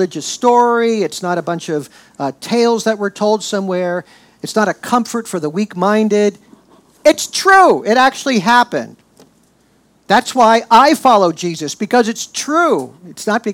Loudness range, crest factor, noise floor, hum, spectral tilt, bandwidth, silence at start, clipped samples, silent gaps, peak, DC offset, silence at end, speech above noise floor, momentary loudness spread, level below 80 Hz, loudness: 5 LU; 14 dB; -54 dBFS; none; -4 dB/octave; 17.5 kHz; 0 s; under 0.1%; none; 0 dBFS; under 0.1%; 0 s; 40 dB; 13 LU; -58 dBFS; -14 LUFS